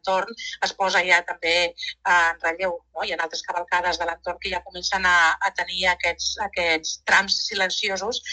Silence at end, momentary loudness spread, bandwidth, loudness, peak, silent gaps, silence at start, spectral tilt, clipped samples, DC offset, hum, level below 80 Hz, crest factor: 0 s; 10 LU; 9.2 kHz; -22 LUFS; -4 dBFS; none; 0.05 s; -1 dB/octave; under 0.1%; under 0.1%; none; -52 dBFS; 20 dB